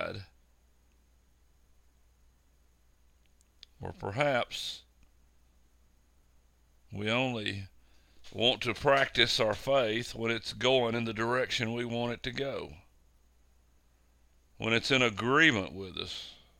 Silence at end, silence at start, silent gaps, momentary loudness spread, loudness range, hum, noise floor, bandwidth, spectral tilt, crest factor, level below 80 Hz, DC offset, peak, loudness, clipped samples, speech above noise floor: 0.25 s; 0 s; none; 16 LU; 9 LU; none; -66 dBFS; 16.5 kHz; -4 dB/octave; 26 dB; -58 dBFS; under 0.1%; -8 dBFS; -30 LUFS; under 0.1%; 35 dB